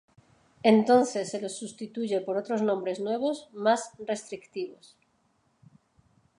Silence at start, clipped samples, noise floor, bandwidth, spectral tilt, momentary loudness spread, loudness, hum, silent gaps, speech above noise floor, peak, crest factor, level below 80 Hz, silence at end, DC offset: 0.65 s; under 0.1%; -70 dBFS; 11 kHz; -5 dB/octave; 15 LU; -28 LUFS; none; none; 43 dB; -8 dBFS; 22 dB; -76 dBFS; 1.65 s; under 0.1%